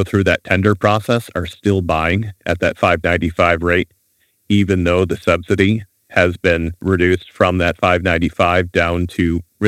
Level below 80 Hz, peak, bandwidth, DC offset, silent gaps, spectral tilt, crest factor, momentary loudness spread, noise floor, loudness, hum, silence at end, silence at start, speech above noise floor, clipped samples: -36 dBFS; 0 dBFS; 14.5 kHz; under 0.1%; none; -6.5 dB/octave; 16 dB; 5 LU; -62 dBFS; -16 LUFS; none; 0 s; 0 s; 46 dB; under 0.1%